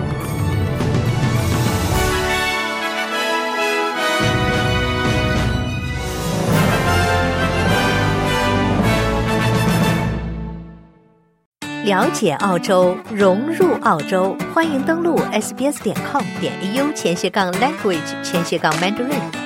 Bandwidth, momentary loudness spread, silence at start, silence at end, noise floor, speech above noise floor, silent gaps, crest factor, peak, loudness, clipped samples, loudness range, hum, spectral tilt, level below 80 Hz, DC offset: 16.5 kHz; 6 LU; 0 s; 0 s; -54 dBFS; 36 dB; 11.46-11.52 s; 16 dB; -2 dBFS; -18 LUFS; under 0.1%; 3 LU; none; -5 dB/octave; -34 dBFS; under 0.1%